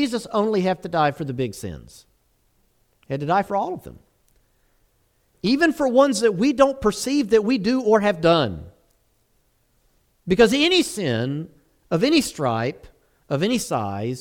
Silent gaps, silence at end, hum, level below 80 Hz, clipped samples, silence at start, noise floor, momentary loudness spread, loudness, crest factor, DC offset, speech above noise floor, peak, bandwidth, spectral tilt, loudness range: none; 0 s; none; -50 dBFS; under 0.1%; 0 s; -65 dBFS; 12 LU; -21 LUFS; 20 dB; under 0.1%; 44 dB; -2 dBFS; 17 kHz; -5 dB/octave; 9 LU